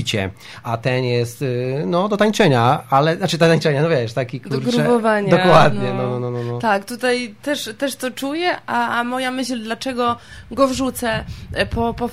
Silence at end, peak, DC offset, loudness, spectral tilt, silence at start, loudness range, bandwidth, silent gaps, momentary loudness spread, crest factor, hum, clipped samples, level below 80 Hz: 0 s; 0 dBFS; under 0.1%; -19 LUFS; -5.5 dB/octave; 0 s; 5 LU; 16 kHz; none; 10 LU; 18 dB; none; under 0.1%; -44 dBFS